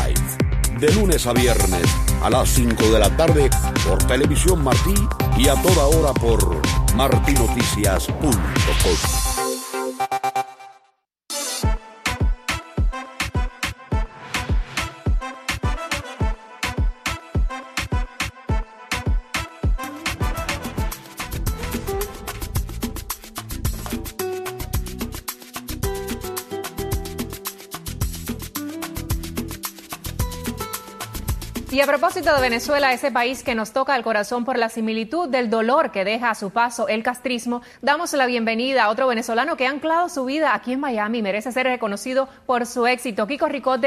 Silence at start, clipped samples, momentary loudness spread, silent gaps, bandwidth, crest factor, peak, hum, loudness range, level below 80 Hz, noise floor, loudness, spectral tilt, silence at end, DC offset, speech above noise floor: 0 s; under 0.1%; 12 LU; none; 14.5 kHz; 20 dB; -2 dBFS; none; 11 LU; -26 dBFS; -63 dBFS; -22 LUFS; -4.5 dB/octave; 0 s; under 0.1%; 44 dB